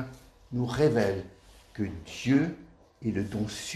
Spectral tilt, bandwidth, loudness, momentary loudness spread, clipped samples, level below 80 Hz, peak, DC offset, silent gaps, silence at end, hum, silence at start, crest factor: -6 dB/octave; 13.5 kHz; -30 LUFS; 17 LU; under 0.1%; -54 dBFS; -12 dBFS; under 0.1%; none; 0 s; none; 0 s; 18 dB